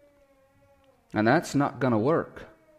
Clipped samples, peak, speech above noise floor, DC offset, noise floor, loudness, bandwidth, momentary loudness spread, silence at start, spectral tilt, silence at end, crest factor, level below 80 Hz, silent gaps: under 0.1%; -10 dBFS; 37 dB; under 0.1%; -62 dBFS; -25 LUFS; 15.5 kHz; 13 LU; 1.15 s; -6.5 dB/octave; 0.35 s; 18 dB; -62 dBFS; none